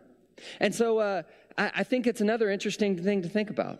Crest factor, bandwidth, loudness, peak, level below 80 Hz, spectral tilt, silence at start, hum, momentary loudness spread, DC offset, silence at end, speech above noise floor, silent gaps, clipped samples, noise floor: 18 dB; 14 kHz; -28 LUFS; -10 dBFS; -72 dBFS; -5 dB/octave; 0.4 s; none; 8 LU; under 0.1%; 0 s; 23 dB; none; under 0.1%; -50 dBFS